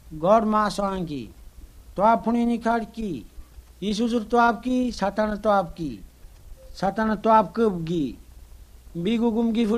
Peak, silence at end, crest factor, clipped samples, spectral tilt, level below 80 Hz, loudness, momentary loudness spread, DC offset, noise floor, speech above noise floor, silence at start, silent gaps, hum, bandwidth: -6 dBFS; 0 s; 18 dB; under 0.1%; -6.5 dB/octave; -46 dBFS; -23 LUFS; 15 LU; under 0.1%; -46 dBFS; 23 dB; 0.05 s; none; none; 14 kHz